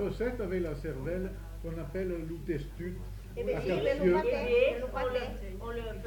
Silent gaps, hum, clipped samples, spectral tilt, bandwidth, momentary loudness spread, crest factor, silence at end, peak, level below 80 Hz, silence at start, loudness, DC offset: none; none; under 0.1%; -7 dB/octave; 19 kHz; 13 LU; 18 dB; 0 s; -14 dBFS; -42 dBFS; 0 s; -33 LUFS; under 0.1%